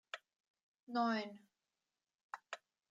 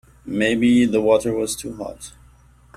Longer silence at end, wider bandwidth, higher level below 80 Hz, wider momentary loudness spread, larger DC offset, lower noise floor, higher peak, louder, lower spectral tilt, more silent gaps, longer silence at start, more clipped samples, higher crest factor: second, 0.35 s vs 0.7 s; second, 9 kHz vs 15 kHz; second, under -90 dBFS vs -48 dBFS; about the same, 17 LU vs 17 LU; neither; first, under -90 dBFS vs -51 dBFS; second, -26 dBFS vs -4 dBFS; second, -42 LUFS vs -19 LUFS; about the same, -4.5 dB/octave vs -5 dB/octave; first, 0.40-0.44 s, 0.50-0.54 s, 0.63-0.74 s, 0.82-0.87 s, 2.15-2.30 s vs none; about the same, 0.15 s vs 0.25 s; neither; about the same, 20 dB vs 16 dB